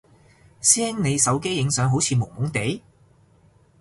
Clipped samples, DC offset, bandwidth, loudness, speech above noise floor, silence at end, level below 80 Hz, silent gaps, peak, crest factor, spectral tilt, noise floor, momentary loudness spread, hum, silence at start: under 0.1%; under 0.1%; 11.5 kHz; -21 LUFS; 35 dB; 1 s; -54 dBFS; none; -2 dBFS; 22 dB; -3.5 dB/octave; -57 dBFS; 9 LU; none; 0.6 s